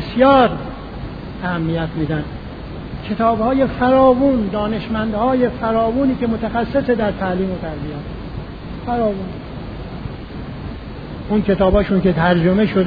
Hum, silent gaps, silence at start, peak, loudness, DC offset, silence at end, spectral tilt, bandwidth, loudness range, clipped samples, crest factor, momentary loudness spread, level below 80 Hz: none; none; 0 s; -2 dBFS; -17 LUFS; under 0.1%; 0 s; -10 dB/octave; 5 kHz; 8 LU; under 0.1%; 16 dB; 17 LU; -34 dBFS